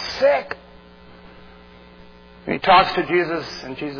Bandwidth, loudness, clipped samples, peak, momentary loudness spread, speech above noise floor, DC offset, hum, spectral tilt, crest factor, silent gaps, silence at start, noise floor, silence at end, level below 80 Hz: 5.4 kHz; -19 LUFS; under 0.1%; -2 dBFS; 19 LU; 26 dB; under 0.1%; none; -5 dB/octave; 20 dB; none; 0 s; -45 dBFS; 0 s; -50 dBFS